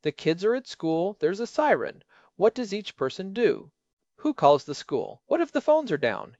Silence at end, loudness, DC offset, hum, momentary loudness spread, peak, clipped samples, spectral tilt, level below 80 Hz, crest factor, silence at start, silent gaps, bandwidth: 0.15 s; -26 LUFS; under 0.1%; none; 9 LU; -6 dBFS; under 0.1%; -5.5 dB/octave; -70 dBFS; 20 dB; 0.05 s; 3.93-3.97 s; 8 kHz